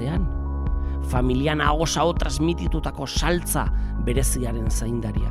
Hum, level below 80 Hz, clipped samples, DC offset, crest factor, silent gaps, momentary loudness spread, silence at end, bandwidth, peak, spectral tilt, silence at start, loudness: none; -26 dBFS; under 0.1%; under 0.1%; 18 dB; none; 6 LU; 0 s; 16 kHz; -6 dBFS; -5 dB/octave; 0 s; -24 LUFS